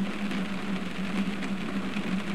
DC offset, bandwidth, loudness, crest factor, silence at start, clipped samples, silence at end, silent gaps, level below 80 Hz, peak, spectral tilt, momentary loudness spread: 2%; 13 kHz; -32 LUFS; 14 dB; 0 s; under 0.1%; 0 s; none; -54 dBFS; -18 dBFS; -6 dB/octave; 2 LU